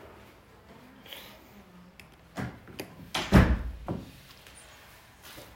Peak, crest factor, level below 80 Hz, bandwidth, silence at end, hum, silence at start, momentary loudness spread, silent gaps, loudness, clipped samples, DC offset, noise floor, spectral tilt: -6 dBFS; 26 dB; -38 dBFS; 16 kHz; 0.1 s; none; 0.05 s; 30 LU; none; -28 LUFS; under 0.1%; under 0.1%; -54 dBFS; -6 dB/octave